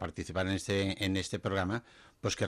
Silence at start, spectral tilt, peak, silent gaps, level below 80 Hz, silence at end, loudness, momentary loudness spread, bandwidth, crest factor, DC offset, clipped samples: 0 s; -5 dB/octave; -20 dBFS; none; -60 dBFS; 0 s; -34 LUFS; 6 LU; 15 kHz; 14 dB; under 0.1%; under 0.1%